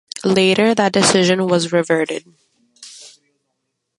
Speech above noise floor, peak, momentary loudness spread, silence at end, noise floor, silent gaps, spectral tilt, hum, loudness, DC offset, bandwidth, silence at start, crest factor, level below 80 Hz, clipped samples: 59 dB; 0 dBFS; 14 LU; 0.9 s; -74 dBFS; none; -4 dB/octave; none; -15 LUFS; under 0.1%; 11.5 kHz; 0.15 s; 18 dB; -60 dBFS; under 0.1%